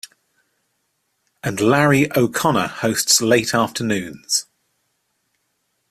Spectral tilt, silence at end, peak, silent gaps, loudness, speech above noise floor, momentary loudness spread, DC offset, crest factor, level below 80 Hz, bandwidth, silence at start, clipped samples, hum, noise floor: -3.5 dB/octave; 1.5 s; 0 dBFS; none; -18 LUFS; 53 dB; 9 LU; under 0.1%; 20 dB; -56 dBFS; 16 kHz; 1.45 s; under 0.1%; none; -70 dBFS